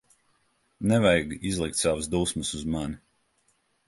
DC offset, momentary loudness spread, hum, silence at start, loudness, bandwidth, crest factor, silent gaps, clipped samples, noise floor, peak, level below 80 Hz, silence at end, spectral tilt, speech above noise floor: under 0.1%; 10 LU; none; 0.8 s; -26 LUFS; 12 kHz; 20 dB; none; under 0.1%; -70 dBFS; -8 dBFS; -46 dBFS; 0.9 s; -4.5 dB/octave; 44 dB